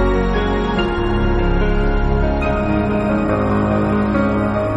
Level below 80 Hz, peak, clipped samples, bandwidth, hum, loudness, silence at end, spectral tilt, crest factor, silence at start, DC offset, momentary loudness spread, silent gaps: -22 dBFS; -4 dBFS; under 0.1%; 8 kHz; none; -18 LUFS; 0 s; -8.5 dB/octave; 12 dB; 0 s; under 0.1%; 2 LU; none